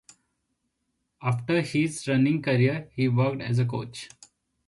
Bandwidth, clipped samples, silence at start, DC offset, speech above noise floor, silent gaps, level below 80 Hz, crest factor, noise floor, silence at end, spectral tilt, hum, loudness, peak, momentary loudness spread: 11.5 kHz; under 0.1%; 1.2 s; under 0.1%; 53 dB; none; -62 dBFS; 16 dB; -78 dBFS; 0.6 s; -6.5 dB/octave; none; -26 LUFS; -12 dBFS; 11 LU